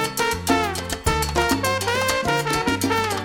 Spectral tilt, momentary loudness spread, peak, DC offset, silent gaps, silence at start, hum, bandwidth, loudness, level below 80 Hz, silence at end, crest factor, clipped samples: -3.5 dB/octave; 2 LU; -4 dBFS; 0.1%; none; 0 s; none; 19.5 kHz; -21 LUFS; -36 dBFS; 0 s; 18 dB; under 0.1%